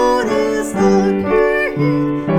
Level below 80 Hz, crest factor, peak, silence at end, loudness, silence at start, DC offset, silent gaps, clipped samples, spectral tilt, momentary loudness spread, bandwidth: -38 dBFS; 12 dB; -2 dBFS; 0 s; -15 LUFS; 0 s; under 0.1%; none; under 0.1%; -6.5 dB/octave; 4 LU; 15.5 kHz